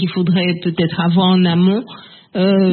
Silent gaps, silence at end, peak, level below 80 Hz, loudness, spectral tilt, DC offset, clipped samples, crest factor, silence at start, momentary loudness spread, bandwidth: none; 0 s; -2 dBFS; -56 dBFS; -15 LUFS; -12.5 dB/octave; under 0.1%; under 0.1%; 12 dB; 0 s; 8 LU; 4.4 kHz